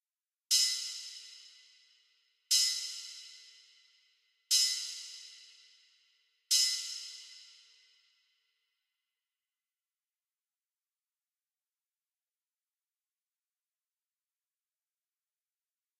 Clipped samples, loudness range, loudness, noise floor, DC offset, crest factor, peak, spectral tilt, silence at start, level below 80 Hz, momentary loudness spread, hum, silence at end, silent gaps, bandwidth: under 0.1%; 3 LU; -30 LUFS; under -90 dBFS; under 0.1%; 26 dB; -14 dBFS; 10.5 dB/octave; 0.5 s; under -90 dBFS; 24 LU; none; 8.55 s; none; 15.5 kHz